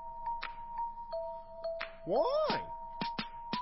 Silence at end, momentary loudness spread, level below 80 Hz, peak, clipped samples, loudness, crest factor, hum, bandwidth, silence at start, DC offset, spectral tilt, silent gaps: 0 s; 11 LU; -58 dBFS; -18 dBFS; under 0.1%; -37 LUFS; 18 dB; none; 5.8 kHz; 0 s; under 0.1%; -8 dB/octave; none